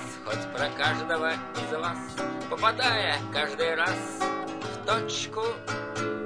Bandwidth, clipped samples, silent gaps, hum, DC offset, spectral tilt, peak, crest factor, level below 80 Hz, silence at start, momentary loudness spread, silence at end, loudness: 11 kHz; under 0.1%; none; none; 0.2%; -3.5 dB/octave; -10 dBFS; 20 dB; -62 dBFS; 0 s; 9 LU; 0 s; -28 LUFS